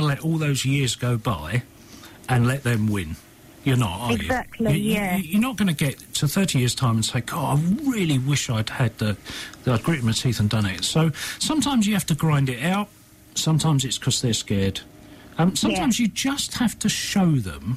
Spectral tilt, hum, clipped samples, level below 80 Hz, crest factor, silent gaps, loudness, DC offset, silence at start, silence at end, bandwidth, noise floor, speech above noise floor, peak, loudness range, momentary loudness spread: -5 dB/octave; none; under 0.1%; -46 dBFS; 12 dB; none; -23 LUFS; under 0.1%; 0 s; 0 s; 15.5 kHz; -44 dBFS; 22 dB; -10 dBFS; 2 LU; 6 LU